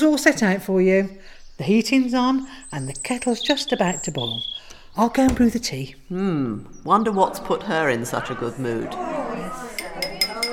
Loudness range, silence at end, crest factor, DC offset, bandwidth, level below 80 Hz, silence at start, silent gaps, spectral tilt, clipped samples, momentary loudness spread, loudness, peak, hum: 2 LU; 0 s; 22 dB; under 0.1%; 18.5 kHz; -44 dBFS; 0 s; none; -4.5 dB/octave; under 0.1%; 13 LU; -22 LUFS; 0 dBFS; none